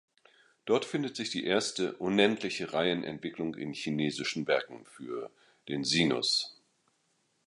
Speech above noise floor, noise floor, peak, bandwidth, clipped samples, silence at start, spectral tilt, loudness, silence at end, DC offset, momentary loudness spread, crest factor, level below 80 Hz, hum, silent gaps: 43 dB; -75 dBFS; -10 dBFS; 11.5 kHz; under 0.1%; 0.65 s; -4 dB/octave; -31 LUFS; 0.95 s; under 0.1%; 14 LU; 22 dB; -68 dBFS; none; none